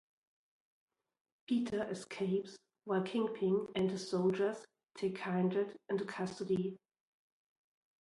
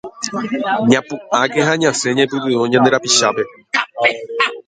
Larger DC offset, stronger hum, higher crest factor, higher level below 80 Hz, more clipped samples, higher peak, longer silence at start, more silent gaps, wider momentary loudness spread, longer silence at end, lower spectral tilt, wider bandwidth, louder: neither; neither; about the same, 16 dB vs 16 dB; second, -78 dBFS vs -60 dBFS; neither; second, -22 dBFS vs 0 dBFS; first, 1.5 s vs 0.05 s; neither; about the same, 8 LU vs 8 LU; first, 1.25 s vs 0.05 s; first, -6.5 dB/octave vs -3 dB/octave; first, 11.5 kHz vs 9.6 kHz; second, -37 LUFS vs -16 LUFS